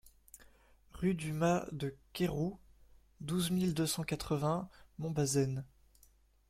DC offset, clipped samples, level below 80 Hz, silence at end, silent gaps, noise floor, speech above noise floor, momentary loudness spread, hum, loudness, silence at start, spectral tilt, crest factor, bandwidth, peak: under 0.1%; under 0.1%; -60 dBFS; 0.85 s; none; -67 dBFS; 32 dB; 11 LU; none; -36 LUFS; 0.05 s; -5.5 dB/octave; 18 dB; 16 kHz; -18 dBFS